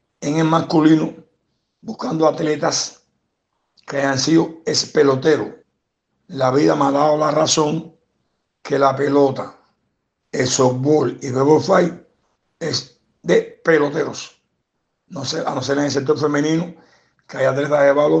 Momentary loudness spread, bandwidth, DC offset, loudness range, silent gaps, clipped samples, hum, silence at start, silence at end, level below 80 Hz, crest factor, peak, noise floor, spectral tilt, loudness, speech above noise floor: 14 LU; 8.8 kHz; under 0.1%; 4 LU; none; under 0.1%; none; 0.2 s; 0 s; -62 dBFS; 16 dB; -2 dBFS; -73 dBFS; -5 dB/octave; -18 LUFS; 56 dB